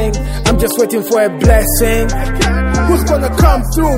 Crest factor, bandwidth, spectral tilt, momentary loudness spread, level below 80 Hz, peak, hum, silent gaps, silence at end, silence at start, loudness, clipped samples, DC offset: 12 dB; 16.5 kHz; -5 dB/octave; 4 LU; -16 dBFS; 0 dBFS; none; none; 0 s; 0 s; -13 LUFS; 0.2%; under 0.1%